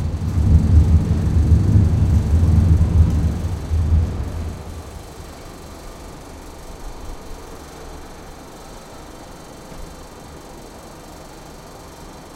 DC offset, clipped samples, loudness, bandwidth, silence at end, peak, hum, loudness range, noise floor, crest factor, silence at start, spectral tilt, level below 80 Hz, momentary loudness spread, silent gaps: under 0.1%; under 0.1%; -17 LUFS; 12.5 kHz; 0 s; -2 dBFS; none; 22 LU; -38 dBFS; 18 dB; 0 s; -8 dB/octave; -26 dBFS; 23 LU; none